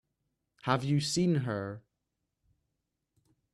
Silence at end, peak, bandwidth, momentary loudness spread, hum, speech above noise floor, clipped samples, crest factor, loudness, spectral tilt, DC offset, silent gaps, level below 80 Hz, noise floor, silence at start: 1.75 s; -14 dBFS; 13 kHz; 13 LU; none; 55 dB; under 0.1%; 22 dB; -31 LUFS; -5.5 dB/octave; under 0.1%; none; -68 dBFS; -84 dBFS; 0.65 s